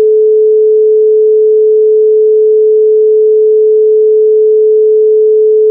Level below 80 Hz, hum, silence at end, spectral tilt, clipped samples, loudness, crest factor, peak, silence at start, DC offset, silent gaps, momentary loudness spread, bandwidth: -86 dBFS; none; 0 s; -11.5 dB/octave; under 0.1%; -7 LUFS; 4 dB; -2 dBFS; 0 s; under 0.1%; none; 0 LU; 0.6 kHz